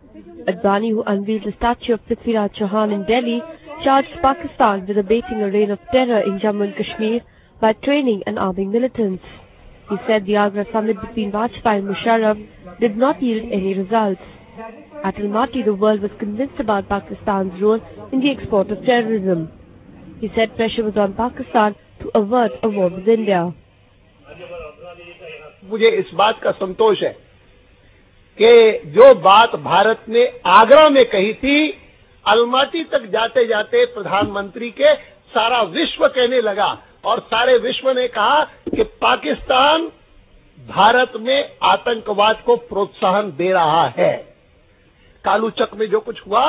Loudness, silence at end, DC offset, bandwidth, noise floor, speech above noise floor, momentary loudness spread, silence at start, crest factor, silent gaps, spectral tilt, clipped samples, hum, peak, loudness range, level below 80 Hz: -17 LUFS; 0 s; under 0.1%; 4 kHz; -52 dBFS; 36 dB; 11 LU; 0.15 s; 18 dB; none; -9 dB/octave; under 0.1%; none; 0 dBFS; 8 LU; -48 dBFS